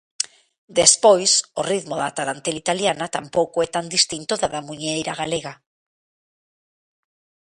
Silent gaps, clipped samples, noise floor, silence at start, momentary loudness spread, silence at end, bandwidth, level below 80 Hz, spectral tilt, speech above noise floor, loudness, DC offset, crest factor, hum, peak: 0.58-0.68 s; under 0.1%; under -90 dBFS; 0.2 s; 13 LU; 1.95 s; 11.5 kHz; -58 dBFS; -2 dB/octave; over 69 dB; -20 LUFS; under 0.1%; 22 dB; none; 0 dBFS